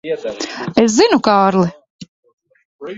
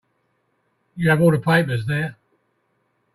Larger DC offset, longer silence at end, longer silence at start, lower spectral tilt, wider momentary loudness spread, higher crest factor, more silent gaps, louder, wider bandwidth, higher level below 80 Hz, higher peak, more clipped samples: neither; second, 0 s vs 1 s; second, 0.05 s vs 0.95 s; second, -4.5 dB/octave vs -7 dB/octave; about the same, 12 LU vs 12 LU; about the same, 16 dB vs 18 dB; first, 1.90-1.99 s, 2.08-2.23 s, 2.33-2.38 s, 2.65-2.79 s vs none; first, -14 LUFS vs -19 LUFS; second, 8 kHz vs 13.5 kHz; about the same, -54 dBFS vs -56 dBFS; first, 0 dBFS vs -4 dBFS; neither